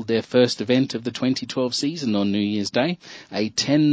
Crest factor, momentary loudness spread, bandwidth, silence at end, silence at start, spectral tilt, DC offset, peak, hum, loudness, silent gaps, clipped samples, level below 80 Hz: 16 dB; 7 LU; 8 kHz; 0 s; 0 s; -5 dB/octave; under 0.1%; -6 dBFS; none; -22 LUFS; none; under 0.1%; -60 dBFS